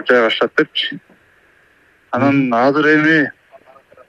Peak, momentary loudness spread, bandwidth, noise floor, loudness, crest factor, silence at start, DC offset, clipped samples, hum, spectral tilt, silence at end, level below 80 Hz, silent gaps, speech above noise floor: 0 dBFS; 11 LU; 7.6 kHz; -53 dBFS; -15 LUFS; 16 dB; 0 s; under 0.1%; under 0.1%; none; -6 dB/octave; 0.75 s; -64 dBFS; none; 39 dB